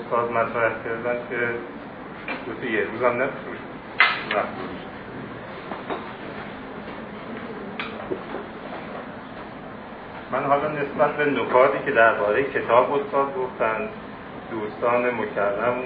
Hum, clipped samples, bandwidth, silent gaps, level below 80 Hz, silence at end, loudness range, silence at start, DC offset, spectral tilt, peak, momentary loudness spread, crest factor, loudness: none; under 0.1%; 5 kHz; none; -56 dBFS; 0 s; 13 LU; 0 s; under 0.1%; -8.5 dB/octave; 0 dBFS; 17 LU; 24 dB; -24 LUFS